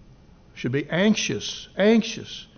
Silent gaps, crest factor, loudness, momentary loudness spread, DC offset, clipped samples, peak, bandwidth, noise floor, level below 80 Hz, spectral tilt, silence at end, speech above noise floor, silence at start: none; 16 dB; -23 LUFS; 12 LU; under 0.1%; under 0.1%; -8 dBFS; 6.6 kHz; -51 dBFS; -56 dBFS; -4.5 dB/octave; 0.15 s; 28 dB; 0.55 s